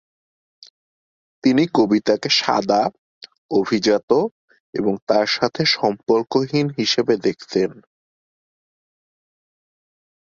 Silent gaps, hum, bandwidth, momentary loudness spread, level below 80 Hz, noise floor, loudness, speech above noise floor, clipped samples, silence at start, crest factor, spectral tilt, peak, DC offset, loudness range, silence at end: 2.99-3.21 s, 3.38-3.49 s, 4.03-4.08 s, 4.31-4.48 s, 4.60-4.73 s, 5.02-5.07 s; none; 7.6 kHz; 6 LU; -62 dBFS; under -90 dBFS; -19 LUFS; over 71 dB; under 0.1%; 1.45 s; 20 dB; -5 dB/octave; -2 dBFS; under 0.1%; 5 LU; 2.5 s